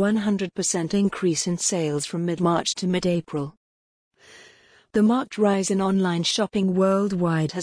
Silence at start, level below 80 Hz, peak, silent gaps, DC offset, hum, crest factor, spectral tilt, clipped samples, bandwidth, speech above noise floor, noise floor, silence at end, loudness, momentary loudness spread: 0 s; -58 dBFS; -8 dBFS; 3.57-4.11 s; under 0.1%; none; 14 dB; -5 dB/octave; under 0.1%; 10.5 kHz; 31 dB; -54 dBFS; 0 s; -23 LUFS; 5 LU